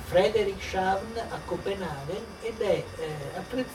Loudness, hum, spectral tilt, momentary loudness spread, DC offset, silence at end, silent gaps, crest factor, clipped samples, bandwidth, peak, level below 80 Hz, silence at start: -30 LUFS; none; -5 dB/octave; 10 LU; under 0.1%; 0 s; none; 18 dB; under 0.1%; 16.5 kHz; -10 dBFS; -50 dBFS; 0 s